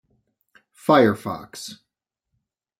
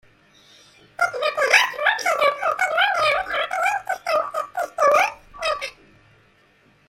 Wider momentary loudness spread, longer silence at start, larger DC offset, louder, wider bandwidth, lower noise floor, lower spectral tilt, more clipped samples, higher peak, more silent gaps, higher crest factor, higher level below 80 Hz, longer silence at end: first, 19 LU vs 11 LU; about the same, 0.9 s vs 1 s; neither; about the same, -20 LUFS vs -20 LUFS; about the same, 16.5 kHz vs 16.5 kHz; first, -83 dBFS vs -57 dBFS; first, -5.5 dB/octave vs 0 dB/octave; neither; about the same, -4 dBFS vs -2 dBFS; neither; about the same, 20 dB vs 22 dB; second, -66 dBFS vs -60 dBFS; second, 1.05 s vs 1.2 s